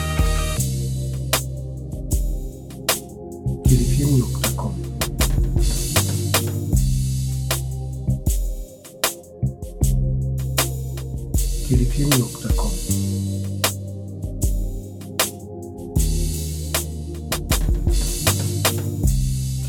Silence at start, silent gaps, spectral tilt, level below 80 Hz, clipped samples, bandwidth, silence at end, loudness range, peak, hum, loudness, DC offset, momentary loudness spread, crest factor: 0 s; none; -4.5 dB/octave; -26 dBFS; under 0.1%; 19 kHz; 0 s; 4 LU; -2 dBFS; none; -23 LUFS; under 0.1%; 10 LU; 18 dB